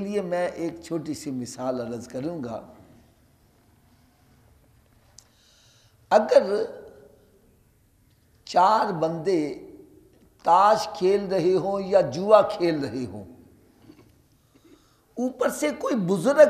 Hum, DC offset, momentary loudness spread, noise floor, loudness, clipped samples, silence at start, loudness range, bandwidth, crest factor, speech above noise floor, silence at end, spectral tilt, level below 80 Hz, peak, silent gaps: none; under 0.1%; 15 LU; -61 dBFS; -24 LUFS; under 0.1%; 0 s; 13 LU; 14.5 kHz; 22 dB; 38 dB; 0 s; -5.5 dB/octave; -62 dBFS; -2 dBFS; none